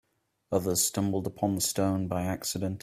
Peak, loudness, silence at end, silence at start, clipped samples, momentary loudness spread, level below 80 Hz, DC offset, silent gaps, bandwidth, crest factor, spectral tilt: -12 dBFS; -29 LUFS; 0.05 s; 0.5 s; under 0.1%; 5 LU; -62 dBFS; under 0.1%; none; 16 kHz; 18 dB; -4.5 dB/octave